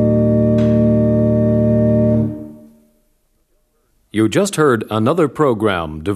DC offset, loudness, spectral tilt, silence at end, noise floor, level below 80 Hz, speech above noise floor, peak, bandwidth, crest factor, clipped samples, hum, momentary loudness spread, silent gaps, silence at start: under 0.1%; -15 LUFS; -7 dB/octave; 0 s; -61 dBFS; -38 dBFS; 46 dB; -2 dBFS; 13.5 kHz; 14 dB; under 0.1%; none; 7 LU; none; 0 s